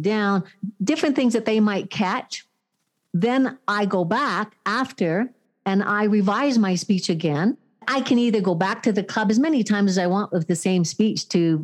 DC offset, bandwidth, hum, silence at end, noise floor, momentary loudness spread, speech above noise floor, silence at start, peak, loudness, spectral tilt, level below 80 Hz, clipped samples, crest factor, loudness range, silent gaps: under 0.1%; 12 kHz; none; 0 s; -75 dBFS; 6 LU; 54 dB; 0 s; -6 dBFS; -22 LUFS; -5.5 dB/octave; -76 dBFS; under 0.1%; 14 dB; 3 LU; none